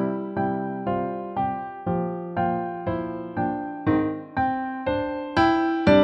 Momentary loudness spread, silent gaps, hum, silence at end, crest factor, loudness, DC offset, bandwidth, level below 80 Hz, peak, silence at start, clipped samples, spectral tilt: 8 LU; none; none; 0 s; 20 dB; -26 LUFS; under 0.1%; 8 kHz; -48 dBFS; -4 dBFS; 0 s; under 0.1%; -8 dB/octave